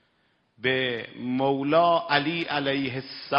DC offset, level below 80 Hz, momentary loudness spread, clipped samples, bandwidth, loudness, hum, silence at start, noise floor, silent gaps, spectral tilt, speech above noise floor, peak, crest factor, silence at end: under 0.1%; -68 dBFS; 10 LU; under 0.1%; 5.8 kHz; -25 LUFS; none; 0.6 s; -68 dBFS; none; -8 dB/octave; 44 dB; -4 dBFS; 22 dB; 0 s